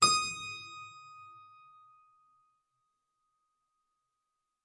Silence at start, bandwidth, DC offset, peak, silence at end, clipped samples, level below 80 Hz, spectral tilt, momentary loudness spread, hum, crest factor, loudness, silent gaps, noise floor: 0 s; 11.5 kHz; under 0.1%; -10 dBFS; 3.25 s; under 0.1%; -74 dBFS; 0 dB/octave; 26 LU; none; 28 dB; -32 LUFS; none; -85 dBFS